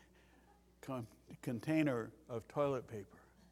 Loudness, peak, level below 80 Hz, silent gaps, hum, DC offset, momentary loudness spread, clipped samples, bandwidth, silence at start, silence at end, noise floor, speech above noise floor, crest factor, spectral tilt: -41 LUFS; -20 dBFS; -72 dBFS; none; none; under 0.1%; 17 LU; under 0.1%; 15.5 kHz; 0.85 s; 0.3 s; -67 dBFS; 27 dB; 22 dB; -7 dB/octave